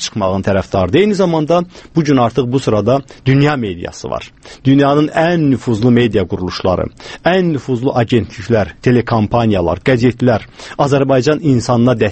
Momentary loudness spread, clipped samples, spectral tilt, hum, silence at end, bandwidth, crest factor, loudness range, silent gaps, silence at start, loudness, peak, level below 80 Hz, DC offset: 8 LU; under 0.1%; -7 dB/octave; none; 0 s; 8.6 kHz; 14 dB; 2 LU; none; 0 s; -14 LUFS; 0 dBFS; -40 dBFS; under 0.1%